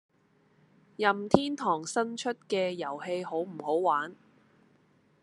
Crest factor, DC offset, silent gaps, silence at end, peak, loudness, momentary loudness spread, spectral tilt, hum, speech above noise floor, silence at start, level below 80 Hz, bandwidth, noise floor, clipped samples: 30 dB; under 0.1%; none; 1.1 s; -2 dBFS; -30 LUFS; 8 LU; -4.5 dB/octave; none; 37 dB; 1 s; -66 dBFS; 12 kHz; -67 dBFS; under 0.1%